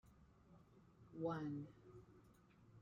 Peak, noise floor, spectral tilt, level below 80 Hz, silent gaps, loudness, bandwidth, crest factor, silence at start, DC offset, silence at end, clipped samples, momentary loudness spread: -32 dBFS; -69 dBFS; -8.5 dB/octave; -78 dBFS; none; -49 LUFS; 10 kHz; 20 dB; 0.05 s; under 0.1%; 0 s; under 0.1%; 23 LU